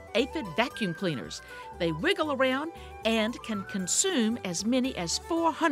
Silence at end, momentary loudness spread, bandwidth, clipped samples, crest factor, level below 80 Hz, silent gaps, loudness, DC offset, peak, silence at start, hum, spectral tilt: 0 s; 9 LU; 16 kHz; under 0.1%; 20 dB; -54 dBFS; none; -29 LUFS; under 0.1%; -8 dBFS; 0 s; none; -3 dB/octave